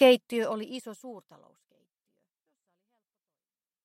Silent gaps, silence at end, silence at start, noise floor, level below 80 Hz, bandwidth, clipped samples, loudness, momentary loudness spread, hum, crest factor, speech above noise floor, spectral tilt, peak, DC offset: none; 2.65 s; 0 s; under -90 dBFS; -86 dBFS; 14 kHz; under 0.1%; -28 LUFS; 23 LU; none; 22 dB; over 63 dB; -4 dB/octave; -8 dBFS; under 0.1%